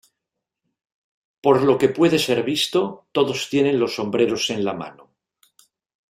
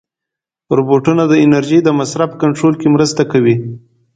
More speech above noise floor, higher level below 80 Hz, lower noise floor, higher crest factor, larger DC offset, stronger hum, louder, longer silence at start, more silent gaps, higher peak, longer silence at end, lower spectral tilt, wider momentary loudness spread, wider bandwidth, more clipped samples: second, 63 dB vs 72 dB; second, -62 dBFS vs -52 dBFS; about the same, -83 dBFS vs -83 dBFS; first, 20 dB vs 12 dB; neither; neither; second, -20 LUFS vs -12 LUFS; first, 1.45 s vs 0.7 s; neither; about the same, -2 dBFS vs 0 dBFS; first, 1.2 s vs 0.35 s; second, -4.5 dB/octave vs -6.5 dB/octave; about the same, 8 LU vs 6 LU; first, 16 kHz vs 9.2 kHz; neither